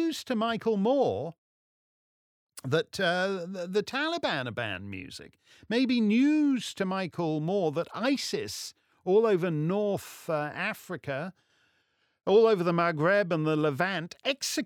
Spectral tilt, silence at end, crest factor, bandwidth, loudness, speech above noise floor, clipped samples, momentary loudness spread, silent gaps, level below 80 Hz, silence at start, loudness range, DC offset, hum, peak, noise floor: -5 dB/octave; 0 s; 18 dB; 18.5 kHz; -28 LUFS; 45 dB; under 0.1%; 13 LU; 1.38-2.47 s; -74 dBFS; 0 s; 4 LU; under 0.1%; none; -12 dBFS; -73 dBFS